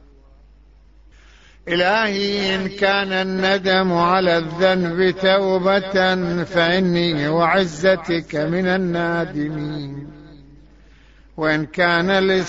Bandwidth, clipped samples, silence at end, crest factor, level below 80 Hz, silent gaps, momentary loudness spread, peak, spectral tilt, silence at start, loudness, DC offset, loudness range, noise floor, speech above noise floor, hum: 8 kHz; under 0.1%; 0 s; 16 dB; -48 dBFS; none; 8 LU; -4 dBFS; -6 dB/octave; 1.65 s; -18 LUFS; 0.1%; 6 LU; -48 dBFS; 30 dB; none